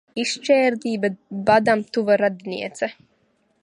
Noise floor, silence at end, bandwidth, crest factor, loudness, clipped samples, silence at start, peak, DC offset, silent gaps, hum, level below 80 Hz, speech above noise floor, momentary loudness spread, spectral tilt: -65 dBFS; 0.7 s; 11.5 kHz; 18 dB; -21 LUFS; under 0.1%; 0.15 s; -4 dBFS; under 0.1%; none; none; -64 dBFS; 44 dB; 11 LU; -4.5 dB/octave